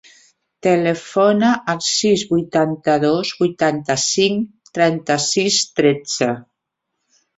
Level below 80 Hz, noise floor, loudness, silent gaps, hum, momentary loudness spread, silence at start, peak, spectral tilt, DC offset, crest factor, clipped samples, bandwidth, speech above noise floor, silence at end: -60 dBFS; -77 dBFS; -17 LUFS; none; none; 5 LU; 0.65 s; -2 dBFS; -3.5 dB/octave; under 0.1%; 16 dB; under 0.1%; 8.4 kHz; 60 dB; 0.95 s